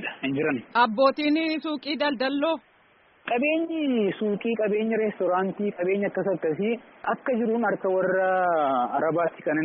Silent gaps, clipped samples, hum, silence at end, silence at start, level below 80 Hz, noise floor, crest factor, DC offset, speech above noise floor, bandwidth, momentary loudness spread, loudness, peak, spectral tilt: none; under 0.1%; none; 0 s; 0 s; -72 dBFS; -59 dBFS; 18 dB; under 0.1%; 35 dB; 5.6 kHz; 6 LU; -25 LUFS; -8 dBFS; -3.5 dB/octave